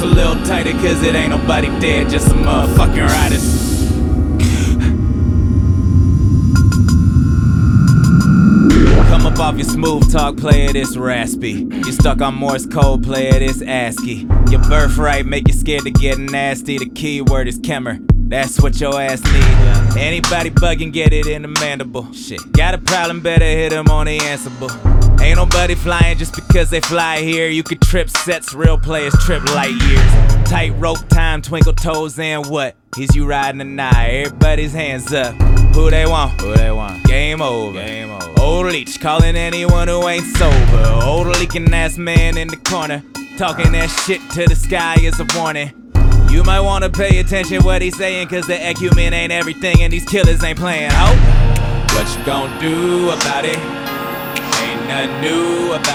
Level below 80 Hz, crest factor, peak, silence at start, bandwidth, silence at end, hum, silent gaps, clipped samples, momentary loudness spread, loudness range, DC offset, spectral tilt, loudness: -16 dBFS; 12 dB; 0 dBFS; 0 s; 16 kHz; 0 s; none; none; under 0.1%; 7 LU; 5 LU; under 0.1%; -5.5 dB/octave; -14 LUFS